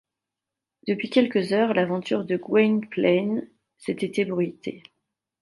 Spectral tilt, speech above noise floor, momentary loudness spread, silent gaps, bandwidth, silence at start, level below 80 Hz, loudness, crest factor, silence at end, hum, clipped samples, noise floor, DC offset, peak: -7 dB/octave; 64 dB; 11 LU; none; 11.5 kHz; 0.85 s; -72 dBFS; -24 LUFS; 18 dB; 0.6 s; none; under 0.1%; -87 dBFS; under 0.1%; -6 dBFS